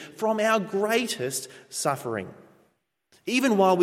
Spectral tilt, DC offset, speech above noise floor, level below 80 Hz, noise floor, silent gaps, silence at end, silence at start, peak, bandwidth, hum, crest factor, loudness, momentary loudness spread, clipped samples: -4 dB/octave; under 0.1%; 45 dB; -78 dBFS; -69 dBFS; none; 0 s; 0 s; -8 dBFS; 16.5 kHz; none; 18 dB; -26 LUFS; 13 LU; under 0.1%